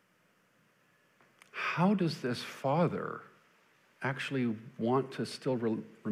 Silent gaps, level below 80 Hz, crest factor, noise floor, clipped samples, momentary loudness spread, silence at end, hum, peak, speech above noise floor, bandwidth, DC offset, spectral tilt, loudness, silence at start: none; -80 dBFS; 20 dB; -70 dBFS; under 0.1%; 10 LU; 0 s; none; -16 dBFS; 37 dB; 15 kHz; under 0.1%; -6.5 dB/octave; -33 LUFS; 1.55 s